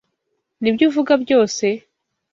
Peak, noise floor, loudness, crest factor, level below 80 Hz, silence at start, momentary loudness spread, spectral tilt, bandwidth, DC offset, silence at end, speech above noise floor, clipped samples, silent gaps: -2 dBFS; -74 dBFS; -17 LUFS; 16 dB; -62 dBFS; 0.6 s; 8 LU; -4.5 dB/octave; 7.6 kHz; under 0.1%; 0.55 s; 57 dB; under 0.1%; none